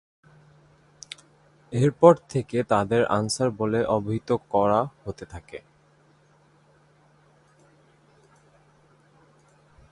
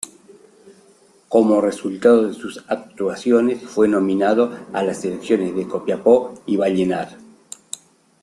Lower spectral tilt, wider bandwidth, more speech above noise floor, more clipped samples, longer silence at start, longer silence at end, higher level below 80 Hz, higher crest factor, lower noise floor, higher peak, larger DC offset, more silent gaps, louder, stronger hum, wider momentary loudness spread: about the same, -6 dB/octave vs -6 dB/octave; about the same, 11.5 kHz vs 12.5 kHz; about the same, 37 dB vs 35 dB; neither; first, 1.7 s vs 0.05 s; first, 4.35 s vs 1.05 s; about the same, -58 dBFS vs -62 dBFS; first, 26 dB vs 18 dB; first, -60 dBFS vs -53 dBFS; about the same, -2 dBFS vs -2 dBFS; neither; neither; second, -23 LUFS vs -19 LUFS; neither; first, 24 LU vs 18 LU